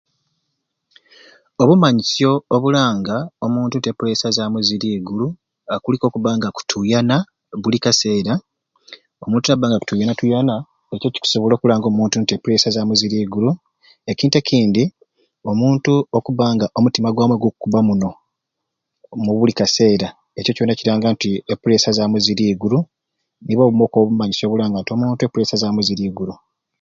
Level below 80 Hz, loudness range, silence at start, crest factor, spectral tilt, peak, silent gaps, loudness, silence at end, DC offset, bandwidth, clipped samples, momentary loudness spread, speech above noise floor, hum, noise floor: -54 dBFS; 3 LU; 1.6 s; 18 dB; -5.5 dB/octave; 0 dBFS; none; -17 LUFS; 0.45 s; under 0.1%; 7.6 kHz; under 0.1%; 9 LU; 63 dB; none; -79 dBFS